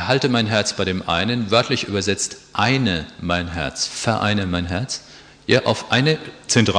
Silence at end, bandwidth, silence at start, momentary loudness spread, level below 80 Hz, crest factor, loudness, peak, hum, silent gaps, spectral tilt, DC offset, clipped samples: 0 s; 10.5 kHz; 0 s; 7 LU; -46 dBFS; 20 dB; -20 LUFS; -2 dBFS; none; none; -4 dB/octave; under 0.1%; under 0.1%